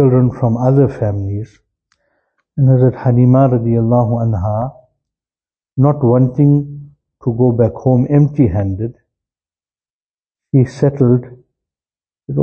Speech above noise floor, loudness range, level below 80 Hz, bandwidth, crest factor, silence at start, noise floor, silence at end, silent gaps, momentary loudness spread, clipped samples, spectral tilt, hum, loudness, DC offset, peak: over 78 dB; 4 LU; -42 dBFS; 6.4 kHz; 14 dB; 0 s; under -90 dBFS; 0 s; 9.90-10.31 s; 12 LU; under 0.1%; -11.5 dB/octave; none; -14 LUFS; under 0.1%; 0 dBFS